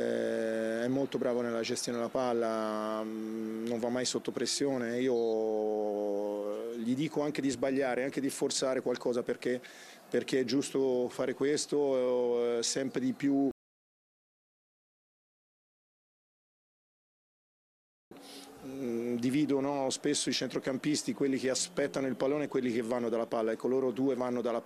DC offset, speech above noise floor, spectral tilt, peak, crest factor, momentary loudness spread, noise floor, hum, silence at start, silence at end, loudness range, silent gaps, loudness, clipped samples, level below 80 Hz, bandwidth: under 0.1%; over 58 dB; -4 dB/octave; -16 dBFS; 16 dB; 6 LU; under -90 dBFS; none; 0 s; 0 s; 5 LU; 13.51-18.11 s; -32 LUFS; under 0.1%; -76 dBFS; 14.5 kHz